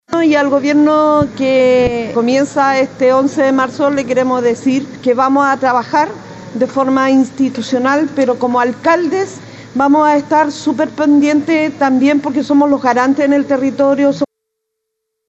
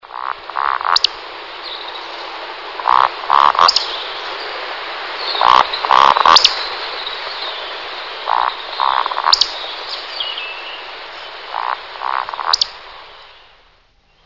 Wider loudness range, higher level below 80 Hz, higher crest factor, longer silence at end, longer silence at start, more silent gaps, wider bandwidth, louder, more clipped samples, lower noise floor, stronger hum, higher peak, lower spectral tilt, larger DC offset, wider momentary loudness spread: second, 2 LU vs 8 LU; about the same, -48 dBFS vs -52 dBFS; second, 12 dB vs 18 dB; about the same, 1.05 s vs 0.95 s; about the same, 0.1 s vs 0.05 s; neither; first, 8.2 kHz vs 6 kHz; about the same, -13 LUFS vs -15 LUFS; second, under 0.1% vs 0.2%; first, -75 dBFS vs -54 dBFS; neither; about the same, -2 dBFS vs 0 dBFS; first, -5.5 dB/octave vs 0 dB/octave; second, under 0.1% vs 0.3%; second, 6 LU vs 17 LU